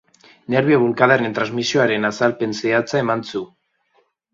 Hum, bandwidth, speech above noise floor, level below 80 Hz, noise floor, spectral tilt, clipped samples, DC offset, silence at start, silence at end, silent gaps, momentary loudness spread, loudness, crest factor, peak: none; 7.8 kHz; 45 dB; -62 dBFS; -63 dBFS; -5.5 dB/octave; under 0.1%; under 0.1%; 0.5 s; 0.9 s; none; 8 LU; -18 LUFS; 20 dB; 0 dBFS